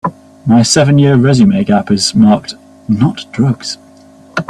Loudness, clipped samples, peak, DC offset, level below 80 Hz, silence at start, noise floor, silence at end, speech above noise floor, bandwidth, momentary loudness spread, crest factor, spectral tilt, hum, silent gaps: -10 LUFS; under 0.1%; 0 dBFS; under 0.1%; -44 dBFS; 0.05 s; -40 dBFS; 0.05 s; 30 dB; 12 kHz; 14 LU; 12 dB; -5.5 dB/octave; none; none